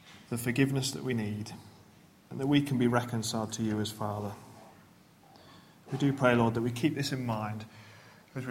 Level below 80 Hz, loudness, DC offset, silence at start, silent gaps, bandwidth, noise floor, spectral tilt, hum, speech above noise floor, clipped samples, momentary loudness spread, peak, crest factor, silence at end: -64 dBFS; -31 LUFS; under 0.1%; 0.05 s; none; 16.5 kHz; -59 dBFS; -5.5 dB/octave; none; 28 dB; under 0.1%; 18 LU; -10 dBFS; 22 dB; 0 s